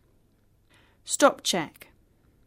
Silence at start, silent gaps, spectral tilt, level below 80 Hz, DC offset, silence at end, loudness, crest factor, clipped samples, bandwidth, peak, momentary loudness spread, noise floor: 1.05 s; none; -2.5 dB/octave; -66 dBFS; under 0.1%; 0.75 s; -24 LUFS; 24 dB; under 0.1%; 16 kHz; -6 dBFS; 18 LU; -64 dBFS